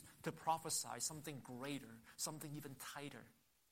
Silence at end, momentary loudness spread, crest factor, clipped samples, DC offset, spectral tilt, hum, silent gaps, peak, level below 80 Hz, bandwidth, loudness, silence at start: 0.4 s; 11 LU; 22 dB; under 0.1%; under 0.1%; -3 dB/octave; none; none; -26 dBFS; -80 dBFS; 16 kHz; -46 LUFS; 0 s